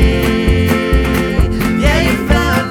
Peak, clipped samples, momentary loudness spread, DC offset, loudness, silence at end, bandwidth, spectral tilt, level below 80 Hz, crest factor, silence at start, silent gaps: 0 dBFS; under 0.1%; 2 LU; under 0.1%; -13 LUFS; 0 s; 18.5 kHz; -6 dB/octave; -16 dBFS; 12 dB; 0 s; none